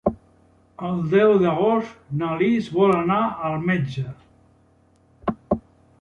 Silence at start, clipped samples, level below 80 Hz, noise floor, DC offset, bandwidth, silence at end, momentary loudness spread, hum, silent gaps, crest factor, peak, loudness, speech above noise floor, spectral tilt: 0.05 s; under 0.1%; -52 dBFS; -58 dBFS; under 0.1%; 8 kHz; 0.4 s; 13 LU; none; none; 18 dB; -6 dBFS; -22 LUFS; 38 dB; -8.5 dB/octave